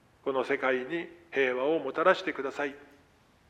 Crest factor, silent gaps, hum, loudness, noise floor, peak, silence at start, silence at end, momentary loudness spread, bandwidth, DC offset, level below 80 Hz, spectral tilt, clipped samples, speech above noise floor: 22 dB; none; none; -30 LUFS; -62 dBFS; -8 dBFS; 0.25 s; 0.65 s; 10 LU; 9.4 kHz; under 0.1%; -72 dBFS; -5 dB/octave; under 0.1%; 33 dB